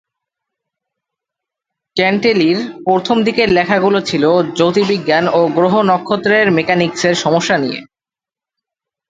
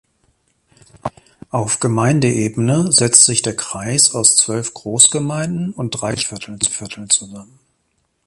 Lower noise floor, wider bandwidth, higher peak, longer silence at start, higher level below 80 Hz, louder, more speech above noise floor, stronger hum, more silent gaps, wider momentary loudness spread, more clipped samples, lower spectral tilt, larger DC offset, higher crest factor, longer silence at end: first, -90 dBFS vs -66 dBFS; second, 9.2 kHz vs 16 kHz; about the same, 0 dBFS vs 0 dBFS; first, 1.95 s vs 1.05 s; about the same, -52 dBFS vs -52 dBFS; about the same, -13 LUFS vs -14 LUFS; first, 77 dB vs 50 dB; neither; neither; second, 4 LU vs 14 LU; neither; first, -5 dB/octave vs -3 dB/octave; neither; about the same, 14 dB vs 18 dB; first, 1.25 s vs 0.85 s